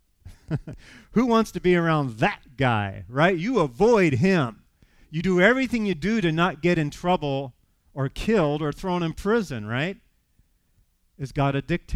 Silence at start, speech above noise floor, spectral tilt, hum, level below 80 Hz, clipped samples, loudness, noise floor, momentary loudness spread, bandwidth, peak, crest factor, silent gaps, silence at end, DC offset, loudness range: 0.25 s; 42 dB; -6.5 dB/octave; none; -46 dBFS; under 0.1%; -23 LUFS; -65 dBFS; 13 LU; 14 kHz; -4 dBFS; 20 dB; none; 0 s; under 0.1%; 5 LU